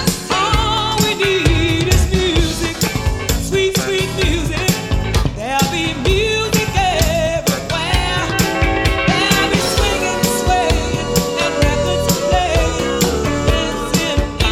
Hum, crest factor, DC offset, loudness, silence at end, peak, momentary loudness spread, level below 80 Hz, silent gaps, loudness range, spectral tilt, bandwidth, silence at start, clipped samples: none; 16 dB; under 0.1%; -16 LUFS; 0 s; 0 dBFS; 4 LU; -24 dBFS; none; 2 LU; -4 dB/octave; 16.5 kHz; 0 s; under 0.1%